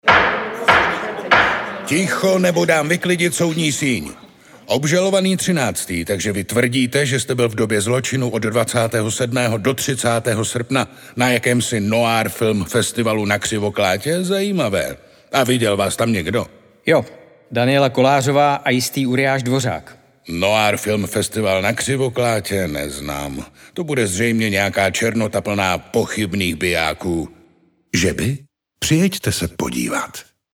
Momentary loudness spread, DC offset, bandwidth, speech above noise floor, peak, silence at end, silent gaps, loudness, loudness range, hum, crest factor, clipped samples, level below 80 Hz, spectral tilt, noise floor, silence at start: 9 LU; under 0.1%; 19 kHz; 37 dB; 0 dBFS; 0.35 s; none; -18 LUFS; 3 LU; none; 18 dB; under 0.1%; -46 dBFS; -4.5 dB/octave; -55 dBFS; 0.05 s